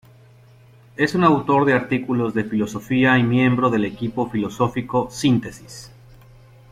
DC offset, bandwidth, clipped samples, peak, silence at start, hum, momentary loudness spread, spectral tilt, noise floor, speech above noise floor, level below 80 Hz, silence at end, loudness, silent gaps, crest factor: under 0.1%; 14.5 kHz; under 0.1%; -4 dBFS; 1 s; none; 9 LU; -6.5 dB/octave; -49 dBFS; 29 dB; -52 dBFS; 0.85 s; -20 LUFS; none; 16 dB